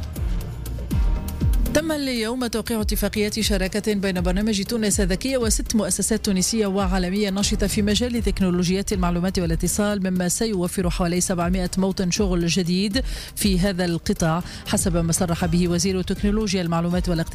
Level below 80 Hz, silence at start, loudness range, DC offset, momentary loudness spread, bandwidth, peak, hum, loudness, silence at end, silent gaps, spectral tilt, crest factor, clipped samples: -30 dBFS; 0 s; 2 LU; under 0.1%; 4 LU; 16 kHz; -10 dBFS; none; -22 LUFS; 0 s; none; -4.5 dB/octave; 12 dB; under 0.1%